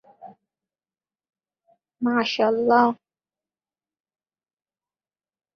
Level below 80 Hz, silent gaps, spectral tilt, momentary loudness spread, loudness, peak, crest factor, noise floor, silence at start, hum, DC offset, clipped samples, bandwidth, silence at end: -72 dBFS; none; -5 dB/octave; 9 LU; -21 LUFS; -4 dBFS; 22 dB; under -90 dBFS; 0.25 s; none; under 0.1%; under 0.1%; 6.8 kHz; 2.65 s